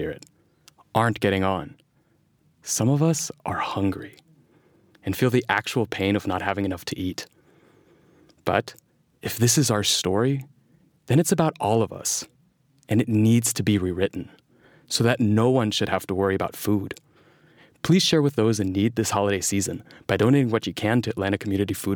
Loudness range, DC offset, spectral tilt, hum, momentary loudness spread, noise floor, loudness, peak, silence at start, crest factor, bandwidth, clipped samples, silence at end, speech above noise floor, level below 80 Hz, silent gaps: 4 LU; under 0.1%; -4.5 dB/octave; none; 12 LU; -64 dBFS; -23 LUFS; -4 dBFS; 0 s; 20 dB; over 20 kHz; under 0.1%; 0 s; 41 dB; -58 dBFS; none